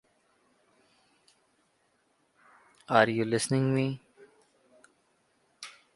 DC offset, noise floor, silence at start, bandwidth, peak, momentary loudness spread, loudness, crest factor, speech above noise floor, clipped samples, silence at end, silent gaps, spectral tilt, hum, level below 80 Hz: under 0.1%; -72 dBFS; 2.9 s; 11.5 kHz; -6 dBFS; 22 LU; -27 LUFS; 26 dB; 46 dB; under 0.1%; 0.25 s; none; -5.5 dB/octave; none; -70 dBFS